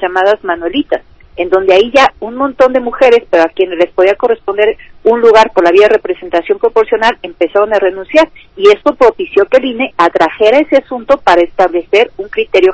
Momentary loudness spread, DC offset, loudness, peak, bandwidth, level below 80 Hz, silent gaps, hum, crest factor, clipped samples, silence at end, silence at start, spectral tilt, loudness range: 8 LU; under 0.1%; -10 LUFS; 0 dBFS; 8 kHz; -44 dBFS; none; none; 10 dB; 4%; 0 s; 0 s; -4 dB/octave; 1 LU